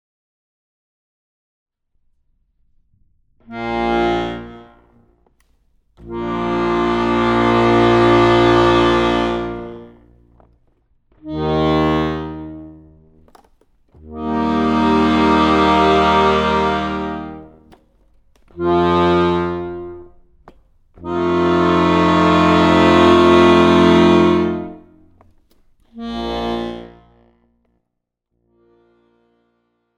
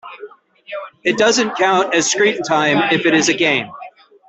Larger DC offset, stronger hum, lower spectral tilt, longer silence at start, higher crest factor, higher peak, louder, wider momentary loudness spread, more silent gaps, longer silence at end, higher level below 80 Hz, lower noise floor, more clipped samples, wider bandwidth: neither; neither; first, -6.5 dB/octave vs -3 dB/octave; first, 3.5 s vs 0.05 s; about the same, 16 dB vs 16 dB; about the same, 0 dBFS vs -2 dBFS; about the same, -15 LUFS vs -15 LUFS; about the same, 18 LU vs 17 LU; neither; first, 3.1 s vs 0.4 s; first, -38 dBFS vs -60 dBFS; first, -77 dBFS vs -38 dBFS; neither; about the same, 9 kHz vs 8.4 kHz